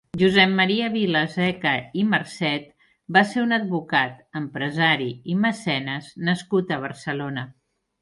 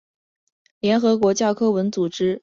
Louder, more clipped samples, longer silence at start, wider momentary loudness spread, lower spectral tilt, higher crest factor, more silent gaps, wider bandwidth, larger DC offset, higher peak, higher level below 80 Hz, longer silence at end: about the same, -22 LUFS vs -20 LUFS; neither; second, 0.15 s vs 0.85 s; first, 11 LU vs 5 LU; about the same, -5.5 dB/octave vs -5.5 dB/octave; first, 20 dB vs 14 dB; neither; first, 11.5 kHz vs 7.6 kHz; neither; first, -2 dBFS vs -6 dBFS; about the same, -62 dBFS vs -62 dBFS; first, 0.5 s vs 0.05 s